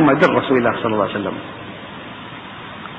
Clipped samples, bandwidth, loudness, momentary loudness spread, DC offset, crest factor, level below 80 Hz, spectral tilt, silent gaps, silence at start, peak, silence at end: under 0.1%; 8 kHz; -17 LUFS; 18 LU; under 0.1%; 20 dB; -54 dBFS; -7.5 dB/octave; none; 0 s; 0 dBFS; 0 s